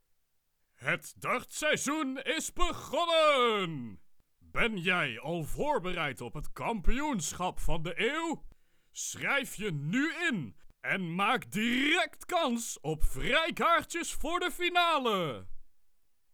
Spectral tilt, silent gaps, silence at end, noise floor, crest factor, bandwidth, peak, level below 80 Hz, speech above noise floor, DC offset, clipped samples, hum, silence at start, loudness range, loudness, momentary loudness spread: -3.5 dB/octave; none; 0.65 s; -75 dBFS; 20 dB; 18 kHz; -12 dBFS; -42 dBFS; 44 dB; under 0.1%; under 0.1%; none; 0.8 s; 4 LU; -31 LUFS; 11 LU